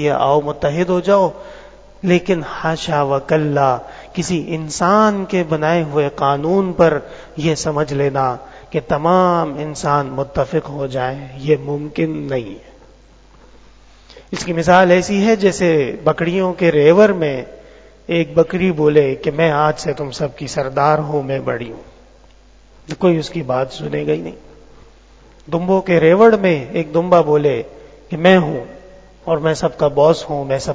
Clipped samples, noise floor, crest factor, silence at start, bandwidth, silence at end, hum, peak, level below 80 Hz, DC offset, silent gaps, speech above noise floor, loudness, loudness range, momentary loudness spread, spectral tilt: under 0.1%; -46 dBFS; 16 dB; 0 s; 8 kHz; 0 s; none; 0 dBFS; -44 dBFS; under 0.1%; none; 30 dB; -16 LUFS; 7 LU; 12 LU; -6 dB/octave